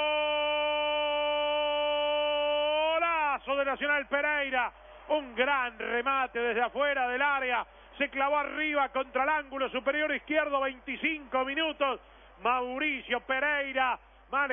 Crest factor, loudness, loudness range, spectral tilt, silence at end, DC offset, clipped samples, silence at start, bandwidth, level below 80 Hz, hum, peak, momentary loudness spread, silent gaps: 16 dB; -29 LUFS; 2 LU; -5 dB/octave; 0 s; under 0.1%; under 0.1%; 0 s; 3.7 kHz; -60 dBFS; none; -14 dBFS; 5 LU; none